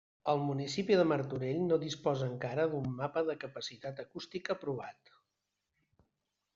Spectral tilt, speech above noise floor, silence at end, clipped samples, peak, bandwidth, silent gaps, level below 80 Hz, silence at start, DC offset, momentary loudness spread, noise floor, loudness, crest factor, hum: -5.5 dB/octave; 52 dB; 1.65 s; under 0.1%; -16 dBFS; 7.6 kHz; none; -72 dBFS; 0.25 s; under 0.1%; 13 LU; -86 dBFS; -35 LUFS; 20 dB; none